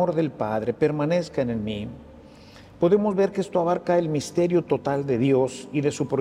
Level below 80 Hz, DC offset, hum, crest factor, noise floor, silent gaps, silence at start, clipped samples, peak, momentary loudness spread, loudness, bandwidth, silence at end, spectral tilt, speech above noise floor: -56 dBFS; under 0.1%; none; 16 dB; -47 dBFS; none; 0 s; under 0.1%; -8 dBFS; 6 LU; -24 LUFS; 12.5 kHz; 0 s; -7 dB/octave; 24 dB